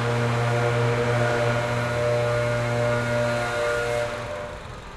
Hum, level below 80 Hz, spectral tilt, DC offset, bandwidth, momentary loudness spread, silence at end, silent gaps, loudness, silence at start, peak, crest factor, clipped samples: none; -46 dBFS; -6 dB/octave; under 0.1%; 13 kHz; 8 LU; 0 s; none; -24 LUFS; 0 s; -12 dBFS; 12 dB; under 0.1%